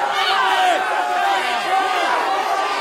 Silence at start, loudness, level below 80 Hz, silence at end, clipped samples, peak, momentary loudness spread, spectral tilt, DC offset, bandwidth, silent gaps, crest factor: 0 s; -18 LUFS; -68 dBFS; 0 s; under 0.1%; -6 dBFS; 3 LU; -0.5 dB/octave; under 0.1%; 16.5 kHz; none; 12 dB